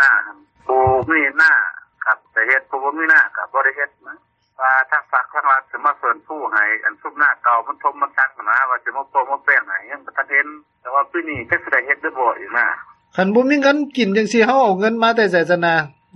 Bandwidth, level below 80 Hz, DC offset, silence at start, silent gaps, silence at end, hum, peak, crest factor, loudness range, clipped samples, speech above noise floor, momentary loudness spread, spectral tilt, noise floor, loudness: 8.8 kHz; -56 dBFS; under 0.1%; 0 s; none; 0.3 s; none; -2 dBFS; 16 dB; 3 LU; under 0.1%; 24 dB; 10 LU; -5 dB/octave; -41 dBFS; -17 LUFS